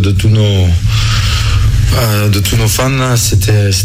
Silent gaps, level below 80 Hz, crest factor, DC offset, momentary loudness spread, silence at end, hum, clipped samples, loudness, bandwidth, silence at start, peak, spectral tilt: none; -18 dBFS; 8 dB; under 0.1%; 2 LU; 0 s; none; under 0.1%; -11 LUFS; 16.5 kHz; 0 s; -2 dBFS; -4.5 dB/octave